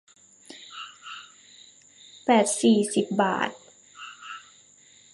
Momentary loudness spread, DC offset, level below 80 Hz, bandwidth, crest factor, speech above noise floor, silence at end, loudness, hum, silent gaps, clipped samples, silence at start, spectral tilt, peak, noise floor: 22 LU; under 0.1%; -76 dBFS; 11.5 kHz; 20 dB; 33 dB; 0.75 s; -23 LUFS; none; none; under 0.1%; 0.5 s; -4 dB/octave; -6 dBFS; -55 dBFS